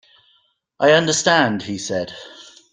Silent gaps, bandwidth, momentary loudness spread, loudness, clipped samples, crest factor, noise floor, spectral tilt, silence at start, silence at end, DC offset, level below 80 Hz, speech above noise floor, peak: none; 10 kHz; 18 LU; -17 LUFS; under 0.1%; 18 dB; -62 dBFS; -3 dB/octave; 0.8 s; 0.3 s; under 0.1%; -60 dBFS; 44 dB; -2 dBFS